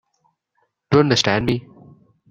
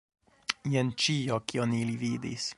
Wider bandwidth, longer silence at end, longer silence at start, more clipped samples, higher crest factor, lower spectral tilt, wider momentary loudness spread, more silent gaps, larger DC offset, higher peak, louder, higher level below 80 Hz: first, 13 kHz vs 11.5 kHz; first, 0.7 s vs 0.05 s; first, 0.9 s vs 0.5 s; neither; about the same, 20 dB vs 24 dB; about the same, -5 dB/octave vs -4.5 dB/octave; about the same, 9 LU vs 7 LU; neither; neither; first, -2 dBFS vs -6 dBFS; first, -18 LUFS vs -30 LUFS; first, -48 dBFS vs -66 dBFS